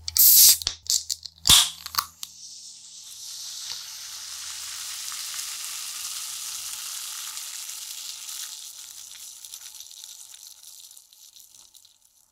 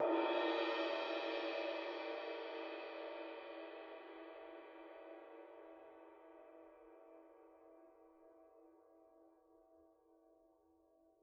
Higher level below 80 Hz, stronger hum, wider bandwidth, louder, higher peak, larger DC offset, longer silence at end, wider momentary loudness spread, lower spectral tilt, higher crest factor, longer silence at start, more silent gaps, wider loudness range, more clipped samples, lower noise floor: first, -54 dBFS vs under -90 dBFS; neither; first, 17 kHz vs 7 kHz; first, -22 LUFS vs -44 LUFS; first, 0 dBFS vs -26 dBFS; neither; second, 0.9 s vs 1.35 s; about the same, 25 LU vs 26 LU; about the same, 1.5 dB/octave vs 1 dB/octave; about the same, 26 dB vs 22 dB; about the same, 0 s vs 0 s; neither; second, 17 LU vs 24 LU; neither; second, -58 dBFS vs -73 dBFS